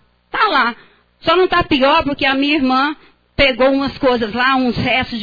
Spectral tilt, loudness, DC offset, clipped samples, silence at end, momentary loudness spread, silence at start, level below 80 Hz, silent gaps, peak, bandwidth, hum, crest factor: -6.5 dB/octave; -15 LUFS; under 0.1%; under 0.1%; 0 s; 7 LU; 0.35 s; -38 dBFS; none; -2 dBFS; 5 kHz; none; 14 dB